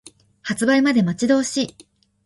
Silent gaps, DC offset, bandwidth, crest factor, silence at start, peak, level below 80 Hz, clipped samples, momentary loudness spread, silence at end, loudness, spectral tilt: none; under 0.1%; 11.5 kHz; 16 dB; 0.45 s; -4 dBFS; -60 dBFS; under 0.1%; 12 LU; 0.55 s; -19 LUFS; -4.5 dB/octave